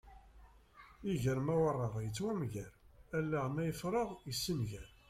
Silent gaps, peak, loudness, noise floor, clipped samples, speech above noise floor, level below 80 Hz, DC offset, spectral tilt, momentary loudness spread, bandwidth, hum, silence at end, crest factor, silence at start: none; -22 dBFS; -38 LUFS; -61 dBFS; under 0.1%; 24 dB; -60 dBFS; under 0.1%; -6 dB/octave; 10 LU; 16 kHz; none; 0.25 s; 16 dB; 0.05 s